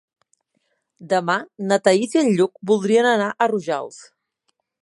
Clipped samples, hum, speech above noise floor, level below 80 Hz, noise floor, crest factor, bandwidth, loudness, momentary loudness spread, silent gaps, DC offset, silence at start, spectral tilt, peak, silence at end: under 0.1%; none; 53 dB; -74 dBFS; -72 dBFS; 18 dB; 11.5 kHz; -19 LUFS; 8 LU; none; under 0.1%; 1 s; -5 dB/octave; -2 dBFS; 0.8 s